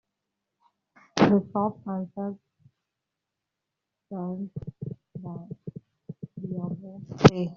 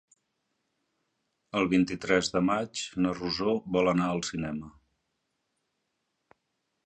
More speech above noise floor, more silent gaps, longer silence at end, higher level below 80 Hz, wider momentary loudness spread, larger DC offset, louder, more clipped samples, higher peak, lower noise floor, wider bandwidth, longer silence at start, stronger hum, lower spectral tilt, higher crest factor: first, 59 dB vs 52 dB; neither; second, 0 s vs 2.15 s; about the same, -54 dBFS vs -58 dBFS; first, 21 LU vs 9 LU; neither; about the same, -27 LUFS vs -28 LUFS; neither; first, -2 dBFS vs -10 dBFS; first, -85 dBFS vs -80 dBFS; second, 7.4 kHz vs 9 kHz; second, 1.15 s vs 1.55 s; neither; first, -6.5 dB/octave vs -5 dB/octave; about the same, 26 dB vs 22 dB